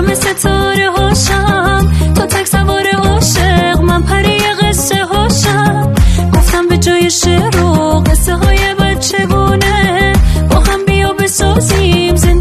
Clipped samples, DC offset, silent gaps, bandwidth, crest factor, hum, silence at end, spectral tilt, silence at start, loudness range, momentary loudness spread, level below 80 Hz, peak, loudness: under 0.1%; under 0.1%; none; 14 kHz; 10 dB; none; 0 s; -4.5 dB/octave; 0 s; 0 LU; 2 LU; -16 dBFS; 0 dBFS; -10 LUFS